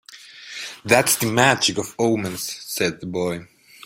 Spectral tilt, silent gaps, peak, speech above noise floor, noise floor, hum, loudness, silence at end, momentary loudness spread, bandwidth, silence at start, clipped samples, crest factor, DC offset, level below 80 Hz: -3 dB/octave; none; 0 dBFS; 21 dB; -42 dBFS; none; -20 LUFS; 0 s; 17 LU; 16.5 kHz; 0.1 s; under 0.1%; 22 dB; under 0.1%; -58 dBFS